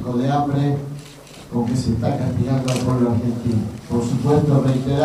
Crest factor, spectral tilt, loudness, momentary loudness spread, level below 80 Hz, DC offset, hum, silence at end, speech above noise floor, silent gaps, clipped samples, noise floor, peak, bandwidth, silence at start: 14 dB; -7.5 dB/octave; -20 LUFS; 10 LU; -42 dBFS; under 0.1%; none; 0 s; 21 dB; none; under 0.1%; -40 dBFS; -4 dBFS; 13.5 kHz; 0 s